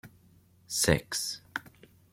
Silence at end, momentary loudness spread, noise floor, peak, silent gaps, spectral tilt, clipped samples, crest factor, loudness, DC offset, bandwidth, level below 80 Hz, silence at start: 0.5 s; 14 LU; -61 dBFS; -8 dBFS; none; -3 dB/octave; under 0.1%; 26 dB; -30 LUFS; under 0.1%; 16.5 kHz; -52 dBFS; 0.05 s